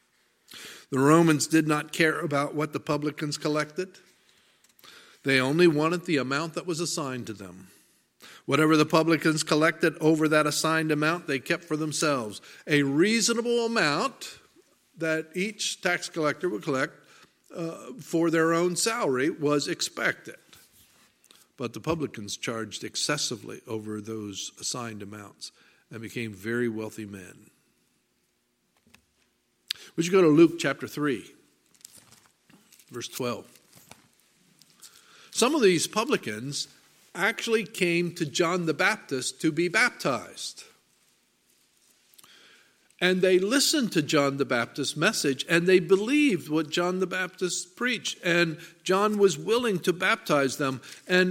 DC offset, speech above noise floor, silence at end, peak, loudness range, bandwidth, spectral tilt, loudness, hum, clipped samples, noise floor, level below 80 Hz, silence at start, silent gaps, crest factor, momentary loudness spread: under 0.1%; 47 dB; 0 s; -6 dBFS; 11 LU; 16.5 kHz; -4 dB/octave; -26 LUFS; none; under 0.1%; -72 dBFS; -72 dBFS; 0.5 s; none; 22 dB; 15 LU